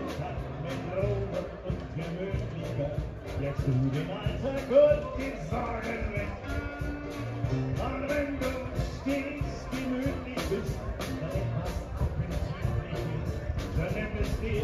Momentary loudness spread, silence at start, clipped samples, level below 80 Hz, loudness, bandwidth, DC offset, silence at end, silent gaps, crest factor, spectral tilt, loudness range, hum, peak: 7 LU; 0 s; under 0.1%; -40 dBFS; -32 LUFS; 14.5 kHz; under 0.1%; 0 s; none; 20 dB; -7 dB/octave; 5 LU; none; -10 dBFS